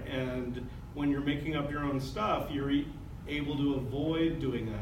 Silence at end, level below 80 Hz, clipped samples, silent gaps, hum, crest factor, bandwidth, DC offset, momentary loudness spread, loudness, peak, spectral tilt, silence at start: 0 s; -46 dBFS; under 0.1%; none; none; 14 dB; 16 kHz; under 0.1%; 8 LU; -33 LUFS; -18 dBFS; -7 dB/octave; 0 s